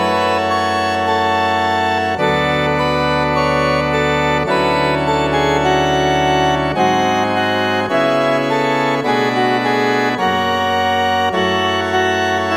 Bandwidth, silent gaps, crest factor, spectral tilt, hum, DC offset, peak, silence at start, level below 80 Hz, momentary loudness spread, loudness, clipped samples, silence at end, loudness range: 17 kHz; none; 14 dB; -5 dB/octave; none; 0.2%; -2 dBFS; 0 s; -38 dBFS; 2 LU; -15 LUFS; under 0.1%; 0 s; 1 LU